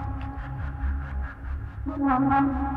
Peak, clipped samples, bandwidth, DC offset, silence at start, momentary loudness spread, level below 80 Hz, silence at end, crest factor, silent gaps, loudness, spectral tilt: -10 dBFS; under 0.1%; 4.3 kHz; under 0.1%; 0 s; 13 LU; -34 dBFS; 0 s; 16 dB; none; -28 LUFS; -10 dB/octave